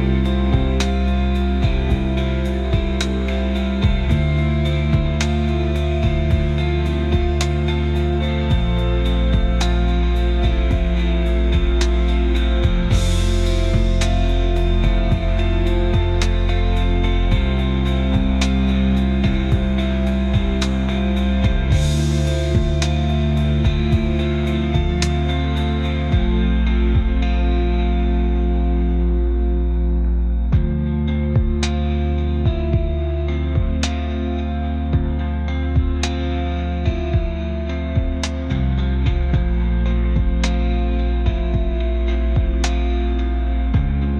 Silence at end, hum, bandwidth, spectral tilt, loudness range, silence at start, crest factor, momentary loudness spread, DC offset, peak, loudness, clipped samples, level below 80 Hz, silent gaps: 0 s; none; 9.6 kHz; -6.5 dB/octave; 3 LU; 0 s; 12 dB; 3 LU; under 0.1%; -4 dBFS; -20 LUFS; under 0.1%; -20 dBFS; none